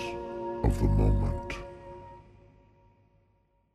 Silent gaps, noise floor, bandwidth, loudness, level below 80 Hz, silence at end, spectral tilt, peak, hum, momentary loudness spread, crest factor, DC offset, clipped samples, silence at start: none; -69 dBFS; 12 kHz; -30 LUFS; -34 dBFS; 1.55 s; -8 dB/octave; -12 dBFS; none; 21 LU; 18 dB; under 0.1%; under 0.1%; 0 s